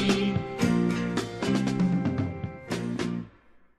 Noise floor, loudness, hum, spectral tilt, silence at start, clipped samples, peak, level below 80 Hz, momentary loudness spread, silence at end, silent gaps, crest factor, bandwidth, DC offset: -56 dBFS; -28 LUFS; none; -6 dB/octave; 0 s; under 0.1%; -10 dBFS; -52 dBFS; 9 LU; 0.5 s; none; 16 dB; 13 kHz; under 0.1%